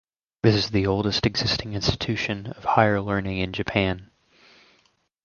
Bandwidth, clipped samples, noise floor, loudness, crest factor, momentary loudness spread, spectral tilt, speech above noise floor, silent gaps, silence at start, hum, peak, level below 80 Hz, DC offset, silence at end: 7.2 kHz; under 0.1%; -65 dBFS; -24 LUFS; 22 dB; 7 LU; -5.5 dB/octave; 42 dB; none; 0.45 s; none; -2 dBFS; -44 dBFS; under 0.1%; 1.2 s